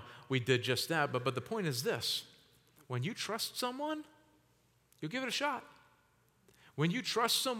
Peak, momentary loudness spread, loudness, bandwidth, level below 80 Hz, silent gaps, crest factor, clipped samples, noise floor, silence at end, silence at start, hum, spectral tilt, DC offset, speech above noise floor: -16 dBFS; 11 LU; -35 LUFS; 18 kHz; -80 dBFS; none; 22 dB; under 0.1%; -71 dBFS; 0 s; 0 s; none; -4 dB/octave; under 0.1%; 36 dB